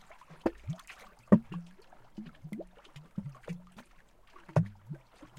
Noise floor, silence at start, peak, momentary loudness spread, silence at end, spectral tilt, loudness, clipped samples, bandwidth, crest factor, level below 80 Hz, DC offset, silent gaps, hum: -59 dBFS; 0.1 s; -8 dBFS; 25 LU; 0.1 s; -9 dB/octave; -34 LUFS; under 0.1%; 11 kHz; 28 dB; -62 dBFS; under 0.1%; none; none